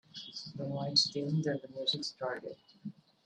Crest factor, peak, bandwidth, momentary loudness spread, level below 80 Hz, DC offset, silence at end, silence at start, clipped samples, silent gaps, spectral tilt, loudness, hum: 24 dB; -14 dBFS; 10 kHz; 20 LU; -78 dBFS; under 0.1%; 0.35 s; 0.15 s; under 0.1%; none; -4 dB/octave; -34 LUFS; none